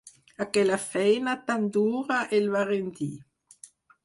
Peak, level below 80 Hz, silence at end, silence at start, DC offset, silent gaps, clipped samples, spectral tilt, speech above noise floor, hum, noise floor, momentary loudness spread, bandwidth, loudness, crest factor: -10 dBFS; -70 dBFS; 0.85 s; 0.05 s; under 0.1%; none; under 0.1%; -5 dB/octave; 28 dB; none; -54 dBFS; 11 LU; 11.5 kHz; -26 LUFS; 18 dB